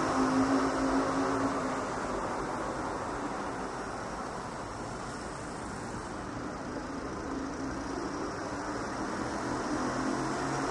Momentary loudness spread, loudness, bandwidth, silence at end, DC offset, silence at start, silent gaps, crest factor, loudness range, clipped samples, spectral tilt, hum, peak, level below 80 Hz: 10 LU; -34 LUFS; 11.5 kHz; 0 s; under 0.1%; 0 s; none; 16 dB; 7 LU; under 0.1%; -5 dB/octave; none; -16 dBFS; -52 dBFS